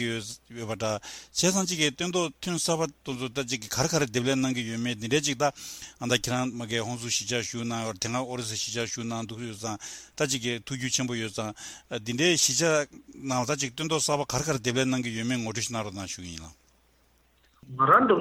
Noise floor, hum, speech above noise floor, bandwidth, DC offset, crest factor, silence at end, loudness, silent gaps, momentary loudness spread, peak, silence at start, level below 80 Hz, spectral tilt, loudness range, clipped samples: -64 dBFS; none; 36 dB; 16.5 kHz; under 0.1%; 22 dB; 0 s; -28 LUFS; none; 12 LU; -8 dBFS; 0 s; -60 dBFS; -3.5 dB/octave; 5 LU; under 0.1%